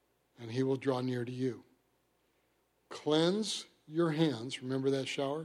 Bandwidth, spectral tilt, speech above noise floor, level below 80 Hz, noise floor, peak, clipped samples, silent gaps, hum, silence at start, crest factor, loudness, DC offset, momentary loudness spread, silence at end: 12.5 kHz; -5.5 dB/octave; 42 dB; -80 dBFS; -75 dBFS; -16 dBFS; under 0.1%; none; none; 0.4 s; 18 dB; -34 LUFS; under 0.1%; 11 LU; 0 s